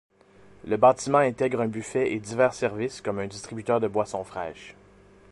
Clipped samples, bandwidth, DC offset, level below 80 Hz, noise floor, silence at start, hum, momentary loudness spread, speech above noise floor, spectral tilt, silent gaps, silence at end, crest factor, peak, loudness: under 0.1%; 11.5 kHz; under 0.1%; -60 dBFS; -54 dBFS; 0.65 s; none; 14 LU; 29 dB; -5.5 dB/octave; none; 0.6 s; 20 dB; -6 dBFS; -26 LUFS